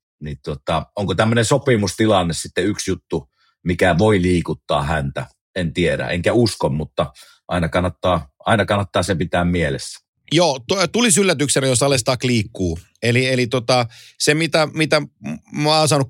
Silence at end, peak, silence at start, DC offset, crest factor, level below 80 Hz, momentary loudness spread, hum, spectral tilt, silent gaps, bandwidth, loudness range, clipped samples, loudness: 0 s; -2 dBFS; 0.2 s; under 0.1%; 18 dB; -42 dBFS; 12 LU; none; -4.5 dB/octave; 5.41-5.54 s, 10.08-10.14 s; 16.5 kHz; 3 LU; under 0.1%; -18 LUFS